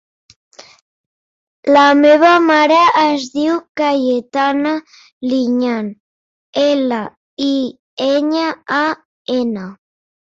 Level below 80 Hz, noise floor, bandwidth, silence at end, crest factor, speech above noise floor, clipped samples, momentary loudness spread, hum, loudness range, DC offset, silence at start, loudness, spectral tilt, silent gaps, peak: -62 dBFS; under -90 dBFS; 7.6 kHz; 0.6 s; 14 dB; over 76 dB; under 0.1%; 15 LU; none; 7 LU; under 0.1%; 0.6 s; -14 LUFS; -4.5 dB/octave; 0.81-1.63 s, 3.69-3.75 s, 5.12-5.21 s, 6.00-6.53 s, 7.17-7.37 s, 7.79-7.97 s, 9.05-9.25 s; -2 dBFS